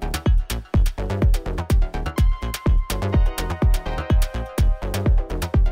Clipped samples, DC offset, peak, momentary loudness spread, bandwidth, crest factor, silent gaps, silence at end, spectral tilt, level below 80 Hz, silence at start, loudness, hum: under 0.1%; under 0.1%; -10 dBFS; 3 LU; 16 kHz; 10 dB; none; 0 s; -6 dB/octave; -20 dBFS; 0 s; -23 LUFS; none